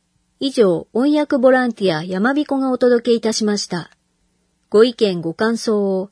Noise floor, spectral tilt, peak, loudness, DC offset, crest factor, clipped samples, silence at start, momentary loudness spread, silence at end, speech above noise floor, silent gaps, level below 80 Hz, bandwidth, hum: -64 dBFS; -5 dB/octave; 0 dBFS; -17 LUFS; under 0.1%; 18 dB; under 0.1%; 0.4 s; 6 LU; 0.05 s; 48 dB; none; -64 dBFS; 11 kHz; none